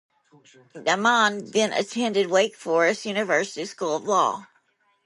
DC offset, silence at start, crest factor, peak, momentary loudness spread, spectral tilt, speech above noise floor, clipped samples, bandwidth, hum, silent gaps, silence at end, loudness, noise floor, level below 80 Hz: under 0.1%; 0.75 s; 18 dB; -6 dBFS; 8 LU; -3 dB/octave; 43 dB; under 0.1%; 11.5 kHz; none; none; 0.6 s; -23 LUFS; -66 dBFS; -76 dBFS